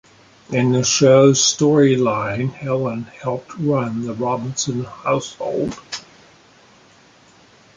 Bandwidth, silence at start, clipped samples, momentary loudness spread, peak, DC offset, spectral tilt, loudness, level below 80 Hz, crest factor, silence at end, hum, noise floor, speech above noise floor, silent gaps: 10 kHz; 0.5 s; under 0.1%; 14 LU; -2 dBFS; under 0.1%; -4.5 dB/octave; -18 LUFS; -54 dBFS; 18 dB; 1.75 s; none; -50 dBFS; 32 dB; none